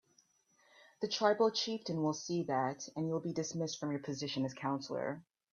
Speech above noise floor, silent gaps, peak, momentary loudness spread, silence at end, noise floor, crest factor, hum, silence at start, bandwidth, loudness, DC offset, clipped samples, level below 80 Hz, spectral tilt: 36 dB; none; -16 dBFS; 8 LU; 0.3 s; -72 dBFS; 22 dB; none; 0.8 s; 7.4 kHz; -36 LUFS; under 0.1%; under 0.1%; -80 dBFS; -4.5 dB/octave